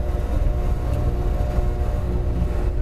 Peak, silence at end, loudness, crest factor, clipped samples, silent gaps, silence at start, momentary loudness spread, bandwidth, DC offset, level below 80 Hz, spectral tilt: -10 dBFS; 0 s; -24 LUFS; 12 dB; under 0.1%; none; 0 s; 1 LU; 13 kHz; 2%; -22 dBFS; -8.5 dB/octave